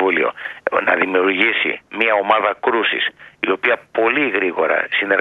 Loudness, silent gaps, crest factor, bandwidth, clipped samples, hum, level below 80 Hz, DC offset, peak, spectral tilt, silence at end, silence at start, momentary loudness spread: -17 LUFS; none; 18 dB; 5 kHz; under 0.1%; none; -66 dBFS; under 0.1%; 0 dBFS; -5.5 dB/octave; 0 s; 0 s; 6 LU